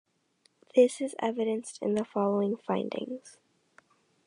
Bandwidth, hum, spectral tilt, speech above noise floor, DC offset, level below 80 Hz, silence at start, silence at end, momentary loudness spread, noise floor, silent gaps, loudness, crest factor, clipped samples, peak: 11 kHz; none; -6 dB/octave; 41 dB; under 0.1%; -80 dBFS; 0.75 s; 0.95 s; 11 LU; -70 dBFS; none; -29 LUFS; 20 dB; under 0.1%; -10 dBFS